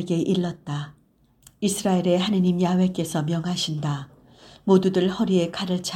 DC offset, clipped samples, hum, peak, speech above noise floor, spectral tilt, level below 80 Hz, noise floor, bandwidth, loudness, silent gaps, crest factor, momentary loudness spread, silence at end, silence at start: under 0.1%; under 0.1%; none; -6 dBFS; 38 dB; -6 dB/octave; -58 dBFS; -60 dBFS; 15.5 kHz; -23 LUFS; none; 18 dB; 12 LU; 0 s; 0 s